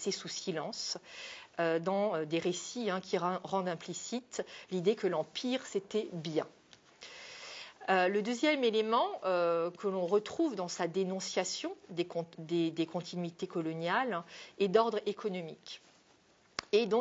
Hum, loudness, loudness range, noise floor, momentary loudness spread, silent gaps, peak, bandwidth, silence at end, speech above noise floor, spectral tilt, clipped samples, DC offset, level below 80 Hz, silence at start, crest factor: none; -34 LUFS; 5 LU; -66 dBFS; 14 LU; none; -14 dBFS; 8.2 kHz; 0 s; 32 dB; -4.5 dB/octave; under 0.1%; under 0.1%; -80 dBFS; 0 s; 22 dB